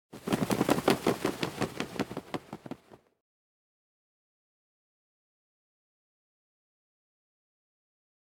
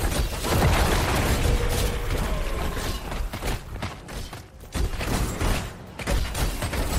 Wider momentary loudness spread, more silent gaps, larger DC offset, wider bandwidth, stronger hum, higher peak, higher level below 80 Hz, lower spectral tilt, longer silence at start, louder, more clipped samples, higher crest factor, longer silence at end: first, 18 LU vs 13 LU; neither; neither; about the same, 17.5 kHz vs 16 kHz; neither; about the same, -8 dBFS vs -10 dBFS; second, -64 dBFS vs -28 dBFS; about the same, -5 dB/octave vs -4.5 dB/octave; about the same, 0.1 s vs 0 s; second, -31 LUFS vs -27 LUFS; neither; first, 28 dB vs 16 dB; first, 5.5 s vs 0 s